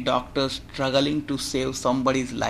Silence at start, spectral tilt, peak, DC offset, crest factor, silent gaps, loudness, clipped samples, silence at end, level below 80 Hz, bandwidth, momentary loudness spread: 0 s; -4.5 dB/octave; -8 dBFS; under 0.1%; 18 dB; none; -25 LUFS; under 0.1%; 0 s; -46 dBFS; 15 kHz; 5 LU